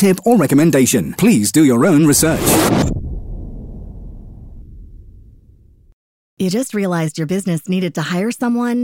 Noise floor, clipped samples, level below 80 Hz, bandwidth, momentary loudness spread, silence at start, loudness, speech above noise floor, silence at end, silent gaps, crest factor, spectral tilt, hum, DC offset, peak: -47 dBFS; under 0.1%; -34 dBFS; 17 kHz; 20 LU; 0 s; -14 LUFS; 33 dB; 0 s; 5.93-6.37 s; 14 dB; -5 dB/octave; none; under 0.1%; -2 dBFS